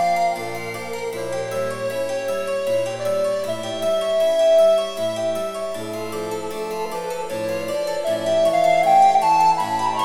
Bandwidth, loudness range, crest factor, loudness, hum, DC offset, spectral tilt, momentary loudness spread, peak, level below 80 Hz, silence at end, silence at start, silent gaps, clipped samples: 16.5 kHz; 6 LU; 14 dB; -21 LUFS; none; under 0.1%; -4 dB/octave; 13 LU; -6 dBFS; -60 dBFS; 0 s; 0 s; none; under 0.1%